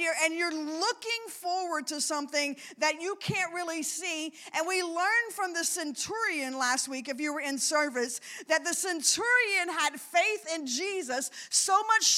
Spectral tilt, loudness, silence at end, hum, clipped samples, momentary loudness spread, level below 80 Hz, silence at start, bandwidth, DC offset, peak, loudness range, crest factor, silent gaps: -1 dB/octave; -29 LUFS; 0 s; none; under 0.1%; 9 LU; -76 dBFS; 0 s; 16.5 kHz; under 0.1%; -10 dBFS; 4 LU; 20 dB; none